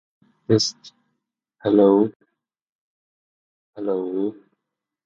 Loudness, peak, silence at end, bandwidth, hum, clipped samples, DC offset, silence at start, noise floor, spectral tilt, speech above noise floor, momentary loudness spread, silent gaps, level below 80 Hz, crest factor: -21 LUFS; -4 dBFS; 0.7 s; 7.8 kHz; none; under 0.1%; under 0.1%; 0.5 s; -83 dBFS; -5.5 dB/octave; 64 dB; 14 LU; 2.16-2.20 s, 2.62-3.73 s; -66 dBFS; 20 dB